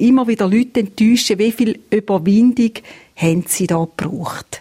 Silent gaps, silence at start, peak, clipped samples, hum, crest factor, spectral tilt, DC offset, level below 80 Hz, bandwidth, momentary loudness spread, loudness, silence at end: none; 0 s; -2 dBFS; under 0.1%; none; 14 dB; -5.5 dB/octave; under 0.1%; -52 dBFS; 16.5 kHz; 10 LU; -16 LUFS; 0 s